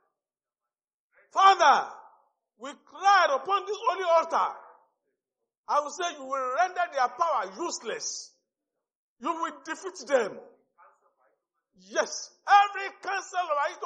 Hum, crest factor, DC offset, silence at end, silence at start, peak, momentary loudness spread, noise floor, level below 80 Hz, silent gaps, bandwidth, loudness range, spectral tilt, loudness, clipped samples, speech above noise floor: none; 20 dB; under 0.1%; 0 s; 1.35 s; -8 dBFS; 16 LU; under -90 dBFS; under -90 dBFS; 5.57-5.64 s, 8.95-9.16 s; 9.2 kHz; 9 LU; -0.5 dB/octave; -26 LUFS; under 0.1%; over 64 dB